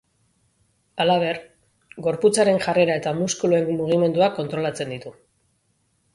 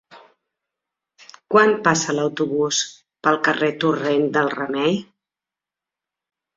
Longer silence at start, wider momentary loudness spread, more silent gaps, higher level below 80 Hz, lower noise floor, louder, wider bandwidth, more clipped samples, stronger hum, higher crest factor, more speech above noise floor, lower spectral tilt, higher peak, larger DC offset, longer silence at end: first, 0.95 s vs 0.1 s; first, 13 LU vs 6 LU; neither; about the same, -62 dBFS vs -64 dBFS; second, -68 dBFS vs -88 dBFS; about the same, -21 LUFS vs -20 LUFS; first, 11.5 kHz vs 7.8 kHz; neither; neither; about the same, 18 dB vs 20 dB; second, 47 dB vs 69 dB; about the same, -5 dB/octave vs -4 dB/octave; second, -6 dBFS vs -2 dBFS; neither; second, 1 s vs 1.55 s